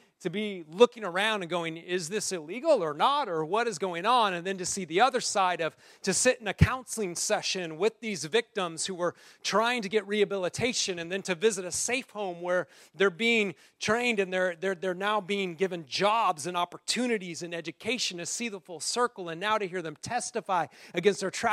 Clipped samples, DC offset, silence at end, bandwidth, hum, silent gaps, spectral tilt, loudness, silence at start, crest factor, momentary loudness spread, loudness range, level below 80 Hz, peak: under 0.1%; under 0.1%; 0 s; 15.5 kHz; none; none; -3.5 dB/octave; -29 LUFS; 0.2 s; 24 dB; 9 LU; 3 LU; -54 dBFS; -6 dBFS